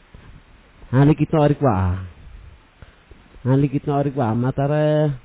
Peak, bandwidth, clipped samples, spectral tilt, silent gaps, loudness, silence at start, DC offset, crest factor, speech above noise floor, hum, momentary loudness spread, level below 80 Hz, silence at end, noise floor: -6 dBFS; 4 kHz; under 0.1%; -12.5 dB/octave; none; -19 LUFS; 0.85 s; under 0.1%; 14 dB; 30 dB; none; 8 LU; -40 dBFS; 0.05 s; -47 dBFS